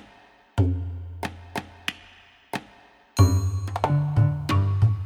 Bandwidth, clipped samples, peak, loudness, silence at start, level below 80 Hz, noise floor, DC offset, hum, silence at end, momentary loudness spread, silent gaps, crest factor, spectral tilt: 13.5 kHz; under 0.1%; -4 dBFS; -25 LUFS; 0.55 s; -42 dBFS; -54 dBFS; under 0.1%; none; 0 s; 15 LU; none; 20 dB; -6.5 dB/octave